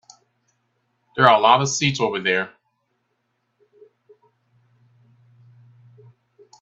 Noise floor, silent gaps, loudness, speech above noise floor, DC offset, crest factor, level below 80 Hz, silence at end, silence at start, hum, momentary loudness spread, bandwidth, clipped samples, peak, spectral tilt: -72 dBFS; none; -18 LUFS; 55 dB; under 0.1%; 24 dB; -66 dBFS; 4.15 s; 1.15 s; none; 14 LU; 8.4 kHz; under 0.1%; 0 dBFS; -3.5 dB/octave